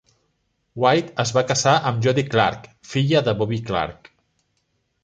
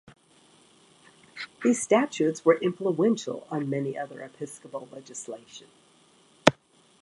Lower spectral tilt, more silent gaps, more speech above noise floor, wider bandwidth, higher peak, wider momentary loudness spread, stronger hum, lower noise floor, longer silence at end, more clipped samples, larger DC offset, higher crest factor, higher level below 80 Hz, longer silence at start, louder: about the same, -5 dB/octave vs -4.5 dB/octave; neither; first, 51 dB vs 33 dB; second, 9.4 kHz vs 11.5 kHz; about the same, -2 dBFS vs 0 dBFS; second, 9 LU vs 17 LU; neither; first, -70 dBFS vs -60 dBFS; first, 1.1 s vs 0.5 s; neither; neither; second, 20 dB vs 28 dB; first, -52 dBFS vs -68 dBFS; second, 0.75 s vs 1.35 s; first, -20 LUFS vs -26 LUFS